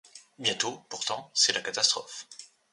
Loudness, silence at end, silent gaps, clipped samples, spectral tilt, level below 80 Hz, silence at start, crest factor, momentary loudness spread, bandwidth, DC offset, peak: -27 LUFS; 0.25 s; none; under 0.1%; 0 dB/octave; -76 dBFS; 0.15 s; 22 dB; 18 LU; 11.5 kHz; under 0.1%; -8 dBFS